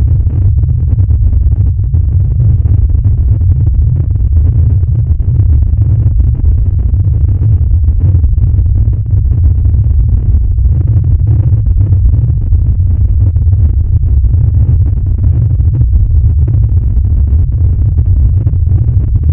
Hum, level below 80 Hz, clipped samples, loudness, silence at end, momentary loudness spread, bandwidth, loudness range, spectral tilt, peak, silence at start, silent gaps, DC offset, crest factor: none; -10 dBFS; 0.4%; -10 LUFS; 0 s; 2 LU; 1.4 kHz; 0 LU; -14 dB/octave; 0 dBFS; 0 s; none; under 0.1%; 8 dB